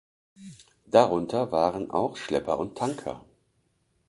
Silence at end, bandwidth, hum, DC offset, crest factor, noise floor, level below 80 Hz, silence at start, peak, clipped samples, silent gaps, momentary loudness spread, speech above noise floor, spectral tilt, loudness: 0.9 s; 11.5 kHz; none; under 0.1%; 24 dB; -71 dBFS; -60 dBFS; 0.4 s; -4 dBFS; under 0.1%; none; 12 LU; 45 dB; -6 dB/octave; -26 LUFS